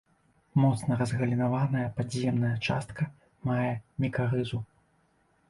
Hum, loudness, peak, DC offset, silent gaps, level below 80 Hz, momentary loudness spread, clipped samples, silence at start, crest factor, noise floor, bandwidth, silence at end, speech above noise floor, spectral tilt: none; -30 LUFS; -12 dBFS; under 0.1%; none; -58 dBFS; 9 LU; under 0.1%; 0.55 s; 16 dB; -68 dBFS; 11.5 kHz; 0.85 s; 40 dB; -7 dB/octave